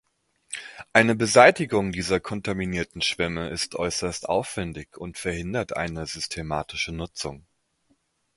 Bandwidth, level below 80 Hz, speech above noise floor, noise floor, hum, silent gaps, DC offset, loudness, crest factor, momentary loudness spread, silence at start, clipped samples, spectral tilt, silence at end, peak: 11.5 kHz; -48 dBFS; 44 dB; -69 dBFS; none; none; under 0.1%; -24 LUFS; 26 dB; 17 LU; 0.5 s; under 0.1%; -4 dB/octave; 0.95 s; 0 dBFS